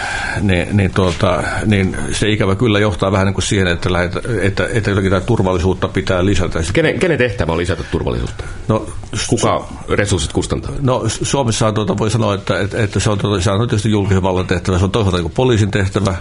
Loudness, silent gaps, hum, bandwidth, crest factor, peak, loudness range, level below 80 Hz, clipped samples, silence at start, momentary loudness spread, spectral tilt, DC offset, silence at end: -16 LUFS; none; none; 11 kHz; 14 dB; -2 dBFS; 3 LU; -30 dBFS; under 0.1%; 0 s; 5 LU; -5.5 dB/octave; under 0.1%; 0 s